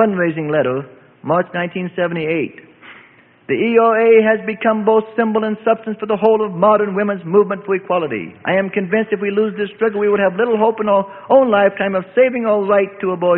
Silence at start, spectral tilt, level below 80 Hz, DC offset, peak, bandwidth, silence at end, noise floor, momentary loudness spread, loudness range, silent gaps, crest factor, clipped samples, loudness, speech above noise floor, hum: 0 s; -11.5 dB/octave; -60 dBFS; under 0.1%; 0 dBFS; 4 kHz; 0 s; -47 dBFS; 8 LU; 4 LU; none; 16 dB; under 0.1%; -16 LUFS; 32 dB; none